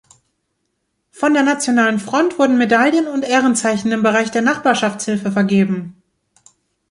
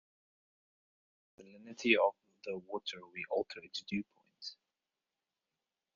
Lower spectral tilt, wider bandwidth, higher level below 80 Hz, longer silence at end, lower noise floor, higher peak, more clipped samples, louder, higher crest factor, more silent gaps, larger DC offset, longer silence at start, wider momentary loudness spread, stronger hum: first, -4.5 dB/octave vs -2 dB/octave; first, 11.5 kHz vs 7.2 kHz; first, -62 dBFS vs -82 dBFS; second, 1 s vs 1.4 s; second, -71 dBFS vs under -90 dBFS; first, -2 dBFS vs -14 dBFS; neither; first, -16 LUFS vs -36 LUFS; second, 14 dB vs 26 dB; neither; neither; second, 1.15 s vs 1.4 s; second, 6 LU vs 20 LU; neither